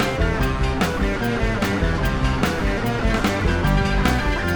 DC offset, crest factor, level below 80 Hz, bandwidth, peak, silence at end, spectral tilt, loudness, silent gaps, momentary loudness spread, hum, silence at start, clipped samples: under 0.1%; 14 dB; -24 dBFS; over 20 kHz; -4 dBFS; 0 s; -6 dB/octave; -21 LUFS; none; 2 LU; none; 0 s; under 0.1%